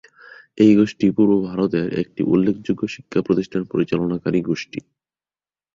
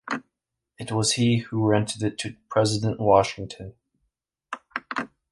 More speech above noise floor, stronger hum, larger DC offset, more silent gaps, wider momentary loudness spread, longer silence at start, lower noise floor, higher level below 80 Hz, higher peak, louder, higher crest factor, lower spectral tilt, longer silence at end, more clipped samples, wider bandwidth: first, over 71 dB vs 60 dB; neither; neither; neither; second, 10 LU vs 19 LU; first, 0.55 s vs 0.05 s; first, under -90 dBFS vs -83 dBFS; about the same, -54 dBFS vs -54 dBFS; about the same, -2 dBFS vs -4 dBFS; first, -20 LUFS vs -24 LUFS; about the same, 18 dB vs 22 dB; first, -8 dB/octave vs -5 dB/octave; first, 0.95 s vs 0.25 s; neither; second, 7.4 kHz vs 11.5 kHz